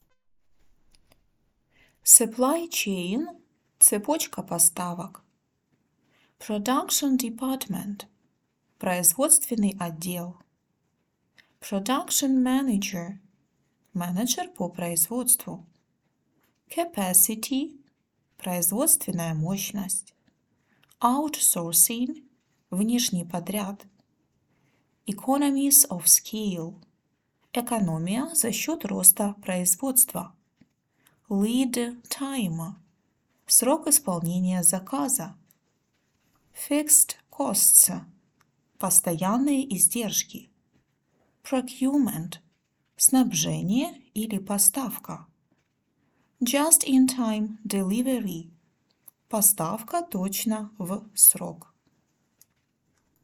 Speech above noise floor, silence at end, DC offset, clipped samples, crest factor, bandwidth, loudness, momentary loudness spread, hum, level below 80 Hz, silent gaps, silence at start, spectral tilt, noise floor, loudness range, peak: 50 dB; 1.65 s; under 0.1%; under 0.1%; 26 dB; 19 kHz; -22 LUFS; 17 LU; none; -66 dBFS; none; 2.05 s; -3 dB/octave; -74 dBFS; 6 LU; 0 dBFS